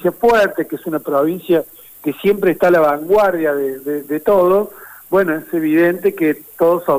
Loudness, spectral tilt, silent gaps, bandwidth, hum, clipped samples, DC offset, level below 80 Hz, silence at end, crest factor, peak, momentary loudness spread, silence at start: -16 LUFS; -6.5 dB/octave; none; 16 kHz; none; under 0.1%; under 0.1%; -52 dBFS; 0 s; 12 dB; -4 dBFS; 10 LU; 0 s